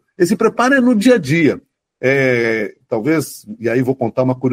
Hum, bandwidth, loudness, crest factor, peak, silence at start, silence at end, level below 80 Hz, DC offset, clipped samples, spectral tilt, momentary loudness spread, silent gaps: none; 16 kHz; -15 LUFS; 14 dB; -2 dBFS; 0.2 s; 0 s; -58 dBFS; under 0.1%; under 0.1%; -6 dB/octave; 9 LU; none